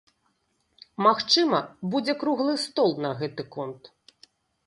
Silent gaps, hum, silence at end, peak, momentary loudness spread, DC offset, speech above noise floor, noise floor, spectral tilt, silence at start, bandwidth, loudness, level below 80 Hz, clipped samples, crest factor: none; none; 0.9 s; -6 dBFS; 15 LU; under 0.1%; 47 dB; -72 dBFS; -4.5 dB/octave; 1 s; 11.5 kHz; -25 LUFS; -72 dBFS; under 0.1%; 20 dB